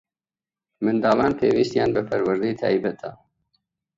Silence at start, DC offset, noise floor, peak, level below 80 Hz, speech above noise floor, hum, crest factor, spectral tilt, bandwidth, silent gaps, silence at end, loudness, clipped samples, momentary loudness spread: 0.8 s; under 0.1%; under -90 dBFS; -6 dBFS; -56 dBFS; over 69 dB; none; 18 dB; -7 dB/octave; 7.8 kHz; none; 0.85 s; -22 LUFS; under 0.1%; 9 LU